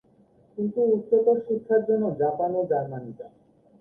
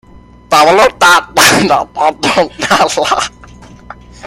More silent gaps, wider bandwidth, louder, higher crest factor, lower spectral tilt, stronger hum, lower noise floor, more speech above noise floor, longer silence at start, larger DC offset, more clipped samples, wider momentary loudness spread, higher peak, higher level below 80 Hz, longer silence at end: neither; second, 1.8 kHz vs over 20 kHz; second, -24 LUFS vs -9 LUFS; first, 16 dB vs 10 dB; first, -12 dB/octave vs -2.5 dB/octave; second, none vs 60 Hz at -40 dBFS; first, -59 dBFS vs -35 dBFS; first, 35 dB vs 26 dB; about the same, 0.55 s vs 0.5 s; neither; second, under 0.1% vs 0.2%; first, 17 LU vs 7 LU; second, -10 dBFS vs 0 dBFS; second, -68 dBFS vs -40 dBFS; first, 0.5 s vs 0 s